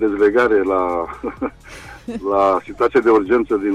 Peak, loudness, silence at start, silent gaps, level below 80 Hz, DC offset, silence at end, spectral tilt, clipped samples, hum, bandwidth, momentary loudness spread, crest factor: -6 dBFS; -17 LUFS; 0 s; none; -44 dBFS; under 0.1%; 0 s; -6.5 dB/octave; under 0.1%; none; 11 kHz; 16 LU; 12 dB